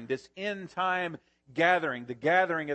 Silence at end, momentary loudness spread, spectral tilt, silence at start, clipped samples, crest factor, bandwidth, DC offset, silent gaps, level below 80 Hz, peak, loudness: 0 s; 12 LU; -5.5 dB/octave; 0 s; under 0.1%; 20 dB; 8.6 kHz; under 0.1%; none; -76 dBFS; -10 dBFS; -29 LUFS